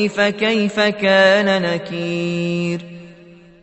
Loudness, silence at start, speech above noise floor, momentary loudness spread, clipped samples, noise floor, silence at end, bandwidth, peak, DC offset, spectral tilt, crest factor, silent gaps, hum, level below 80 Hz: -17 LUFS; 0 s; 27 dB; 11 LU; under 0.1%; -44 dBFS; 0.5 s; 8.4 kHz; -2 dBFS; under 0.1%; -5.5 dB/octave; 16 dB; none; none; -60 dBFS